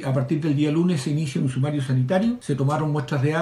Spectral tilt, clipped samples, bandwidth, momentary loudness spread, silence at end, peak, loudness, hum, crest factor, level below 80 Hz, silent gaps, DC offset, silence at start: -7.5 dB/octave; under 0.1%; 12 kHz; 3 LU; 0 s; -10 dBFS; -23 LUFS; none; 12 dB; -58 dBFS; none; under 0.1%; 0 s